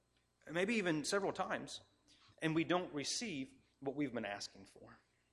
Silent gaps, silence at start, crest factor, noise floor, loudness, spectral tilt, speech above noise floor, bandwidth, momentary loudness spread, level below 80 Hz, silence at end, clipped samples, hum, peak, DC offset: none; 0.45 s; 20 dB; -68 dBFS; -40 LUFS; -4 dB/octave; 28 dB; 14.5 kHz; 14 LU; -76 dBFS; 0.4 s; under 0.1%; 60 Hz at -70 dBFS; -22 dBFS; under 0.1%